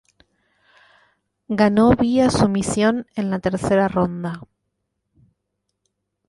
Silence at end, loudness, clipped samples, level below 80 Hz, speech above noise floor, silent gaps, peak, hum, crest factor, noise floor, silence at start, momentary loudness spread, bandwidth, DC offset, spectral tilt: 1.85 s; -19 LUFS; under 0.1%; -44 dBFS; 58 dB; none; -4 dBFS; 50 Hz at -45 dBFS; 18 dB; -76 dBFS; 1.5 s; 12 LU; 11.5 kHz; under 0.1%; -6 dB/octave